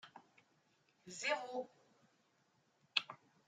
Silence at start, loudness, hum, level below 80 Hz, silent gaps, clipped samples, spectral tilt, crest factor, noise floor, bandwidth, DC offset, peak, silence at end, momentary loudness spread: 0.05 s; -41 LUFS; none; under -90 dBFS; none; under 0.1%; -1 dB/octave; 34 dB; -77 dBFS; 10.5 kHz; under 0.1%; -14 dBFS; 0.3 s; 16 LU